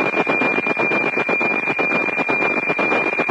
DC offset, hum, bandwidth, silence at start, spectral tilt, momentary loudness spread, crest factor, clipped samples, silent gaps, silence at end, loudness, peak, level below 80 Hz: under 0.1%; none; 10.5 kHz; 0 s; -5.5 dB/octave; 1 LU; 14 dB; under 0.1%; none; 0 s; -17 LUFS; -4 dBFS; -68 dBFS